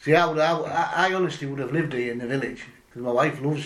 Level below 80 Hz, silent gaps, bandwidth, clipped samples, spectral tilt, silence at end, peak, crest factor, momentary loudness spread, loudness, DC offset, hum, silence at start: -62 dBFS; none; 13 kHz; under 0.1%; -6 dB/octave; 0 s; -6 dBFS; 18 dB; 12 LU; -24 LUFS; under 0.1%; none; 0 s